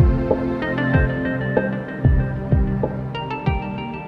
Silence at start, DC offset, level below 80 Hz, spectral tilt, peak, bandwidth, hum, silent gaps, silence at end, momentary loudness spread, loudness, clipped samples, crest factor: 0 s; under 0.1%; -26 dBFS; -9.5 dB/octave; -4 dBFS; 5.4 kHz; none; none; 0 s; 7 LU; -21 LUFS; under 0.1%; 16 dB